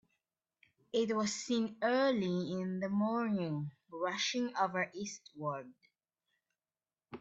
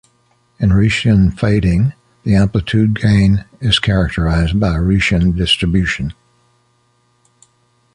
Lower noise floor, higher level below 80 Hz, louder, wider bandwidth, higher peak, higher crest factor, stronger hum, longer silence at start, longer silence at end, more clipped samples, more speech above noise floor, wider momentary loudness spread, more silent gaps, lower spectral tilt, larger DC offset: first, under -90 dBFS vs -58 dBFS; second, -80 dBFS vs -26 dBFS; second, -36 LUFS vs -14 LUFS; second, 8.2 kHz vs 10.5 kHz; second, -18 dBFS vs 0 dBFS; first, 20 dB vs 14 dB; neither; first, 0.95 s vs 0.6 s; second, 0 s vs 1.8 s; neither; first, over 55 dB vs 45 dB; first, 10 LU vs 6 LU; neither; second, -4.5 dB/octave vs -6.5 dB/octave; neither